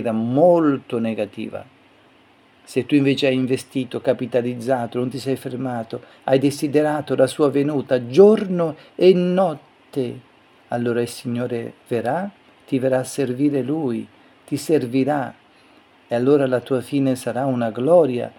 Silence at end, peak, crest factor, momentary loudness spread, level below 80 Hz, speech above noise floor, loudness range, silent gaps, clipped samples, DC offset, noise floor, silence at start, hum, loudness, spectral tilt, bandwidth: 0.1 s; 0 dBFS; 20 dB; 13 LU; -68 dBFS; 34 dB; 6 LU; none; under 0.1%; under 0.1%; -53 dBFS; 0 s; none; -20 LUFS; -6.5 dB/octave; 17.5 kHz